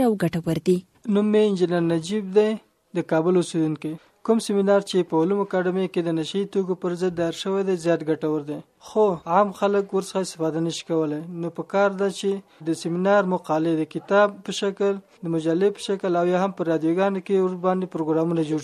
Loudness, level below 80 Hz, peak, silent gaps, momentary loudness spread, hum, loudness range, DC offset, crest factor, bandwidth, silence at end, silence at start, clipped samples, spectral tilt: -23 LUFS; -66 dBFS; -6 dBFS; none; 8 LU; none; 2 LU; under 0.1%; 18 dB; 13.5 kHz; 0 s; 0 s; under 0.1%; -6.5 dB/octave